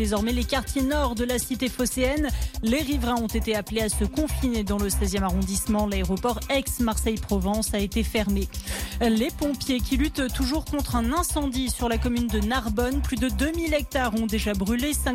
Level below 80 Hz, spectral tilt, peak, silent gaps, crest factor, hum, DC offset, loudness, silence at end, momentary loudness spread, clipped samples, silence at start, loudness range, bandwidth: -32 dBFS; -4.5 dB/octave; -12 dBFS; none; 12 dB; none; under 0.1%; -25 LUFS; 0 s; 2 LU; under 0.1%; 0 s; 0 LU; 17 kHz